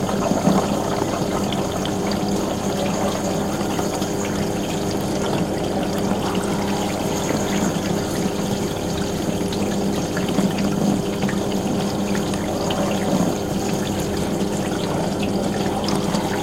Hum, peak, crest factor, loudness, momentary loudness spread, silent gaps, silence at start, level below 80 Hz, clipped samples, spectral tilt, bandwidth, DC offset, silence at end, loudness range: none; -6 dBFS; 16 dB; -22 LUFS; 3 LU; none; 0 s; -40 dBFS; under 0.1%; -5 dB/octave; 16.5 kHz; under 0.1%; 0 s; 1 LU